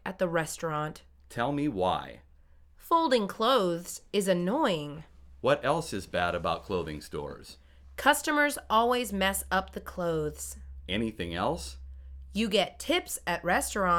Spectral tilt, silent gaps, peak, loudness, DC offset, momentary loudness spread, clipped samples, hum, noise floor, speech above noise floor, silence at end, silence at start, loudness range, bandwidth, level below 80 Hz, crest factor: -4 dB/octave; none; -8 dBFS; -29 LUFS; under 0.1%; 15 LU; under 0.1%; none; -57 dBFS; 28 dB; 0 s; 0.05 s; 4 LU; 19.5 kHz; -50 dBFS; 22 dB